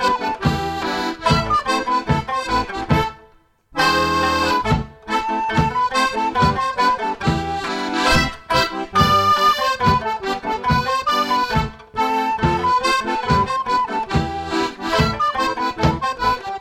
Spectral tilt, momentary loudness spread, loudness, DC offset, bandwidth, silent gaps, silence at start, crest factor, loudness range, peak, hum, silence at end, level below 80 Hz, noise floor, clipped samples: -5 dB/octave; 6 LU; -19 LUFS; under 0.1%; 16.5 kHz; none; 0 s; 16 dB; 2 LU; -2 dBFS; none; 0 s; -36 dBFS; -52 dBFS; under 0.1%